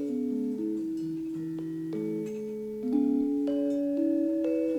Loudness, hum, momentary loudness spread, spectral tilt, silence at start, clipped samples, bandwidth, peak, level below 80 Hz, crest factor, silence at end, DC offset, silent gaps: -30 LUFS; none; 8 LU; -8.5 dB/octave; 0 s; under 0.1%; 11 kHz; -16 dBFS; -66 dBFS; 14 dB; 0 s; under 0.1%; none